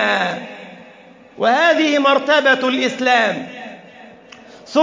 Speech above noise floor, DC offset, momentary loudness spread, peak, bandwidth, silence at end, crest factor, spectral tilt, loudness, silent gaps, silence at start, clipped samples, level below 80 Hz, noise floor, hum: 28 dB; under 0.1%; 20 LU; -2 dBFS; 7.6 kHz; 0 s; 16 dB; -3.5 dB/octave; -15 LUFS; none; 0 s; under 0.1%; -70 dBFS; -44 dBFS; none